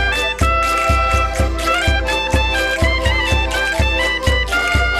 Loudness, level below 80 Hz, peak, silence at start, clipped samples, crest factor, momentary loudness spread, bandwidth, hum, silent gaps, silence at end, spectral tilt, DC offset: -16 LUFS; -20 dBFS; -2 dBFS; 0 s; under 0.1%; 14 dB; 2 LU; 14.5 kHz; none; none; 0 s; -4 dB/octave; under 0.1%